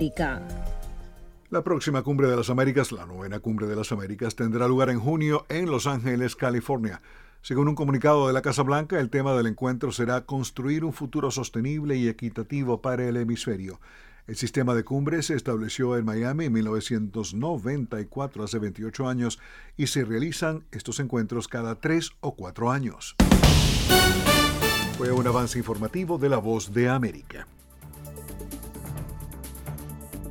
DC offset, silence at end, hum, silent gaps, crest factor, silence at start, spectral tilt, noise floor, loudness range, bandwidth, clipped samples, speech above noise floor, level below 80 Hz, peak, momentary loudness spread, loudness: under 0.1%; 0 s; none; none; 20 dB; 0 s; -5 dB/octave; -46 dBFS; 8 LU; 18 kHz; under 0.1%; 20 dB; -38 dBFS; -4 dBFS; 17 LU; -26 LUFS